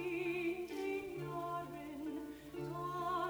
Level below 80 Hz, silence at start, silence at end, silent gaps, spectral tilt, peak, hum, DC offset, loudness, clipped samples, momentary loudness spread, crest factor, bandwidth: -68 dBFS; 0 s; 0 s; none; -6 dB/octave; -28 dBFS; none; under 0.1%; -42 LUFS; under 0.1%; 8 LU; 14 dB; over 20 kHz